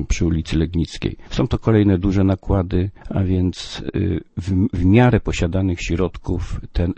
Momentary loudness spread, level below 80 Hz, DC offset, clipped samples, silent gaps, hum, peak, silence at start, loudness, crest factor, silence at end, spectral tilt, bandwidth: 10 LU; -30 dBFS; under 0.1%; under 0.1%; none; none; 0 dBFS; 0 s; -20 LUFS; 18 dB; 0.05 s; -7 dB/octave; 8.6 kHz